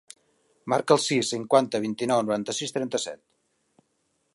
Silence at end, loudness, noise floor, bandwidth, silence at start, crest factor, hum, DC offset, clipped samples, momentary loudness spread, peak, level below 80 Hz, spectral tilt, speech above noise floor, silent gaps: 1.2 s; -25 LUFS; -73 dBFS; 11.5 kHz; 0.65 s; 22 dB; none; under 0.1%; under 0.1%; 10 LU; -6 dBFS; -74 dBFS; -4 dB/octave; 48 dB; none